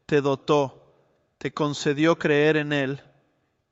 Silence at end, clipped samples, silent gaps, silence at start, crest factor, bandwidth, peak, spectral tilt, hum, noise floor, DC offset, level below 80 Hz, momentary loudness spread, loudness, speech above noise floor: 0.75 s; under 0.1%; none; 0.1 s; 16 dB; 8 kHz; -8 dBFS; -6 dB/octave; none; -70 dBFS; under 0.1%; -64 dBFS; 12 LU; -23 LUFS; 47 dB